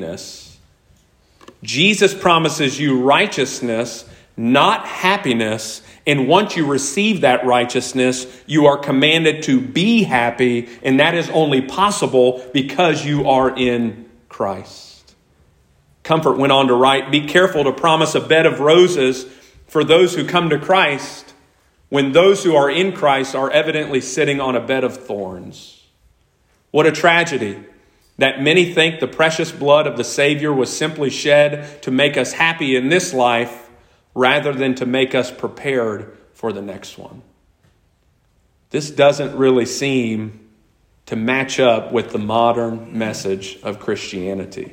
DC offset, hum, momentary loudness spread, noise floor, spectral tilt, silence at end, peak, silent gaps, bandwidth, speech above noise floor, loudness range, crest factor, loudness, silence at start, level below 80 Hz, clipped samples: under 0.1%; none; 13 LU; -59 dBFS; -4.5 dB/octave; 0.05 s; 0 dBFS; none; 16.5 kHz; 43 dB; 5 LU; 16 dB; -16 LUFS; 0 s; -56 dBFS; under 0.1%